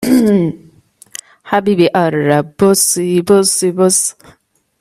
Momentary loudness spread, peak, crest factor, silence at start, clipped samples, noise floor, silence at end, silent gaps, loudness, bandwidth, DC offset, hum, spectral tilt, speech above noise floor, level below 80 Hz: 13 LU; 0 dBFS; 14 dB; 0 s; under 0.1%; -36 dBFS; 0.7 s; none; -12 LUFS; 16 kHz; under 0.1%; none; -4.5 dB/octave; 24 dB; -54 dBFS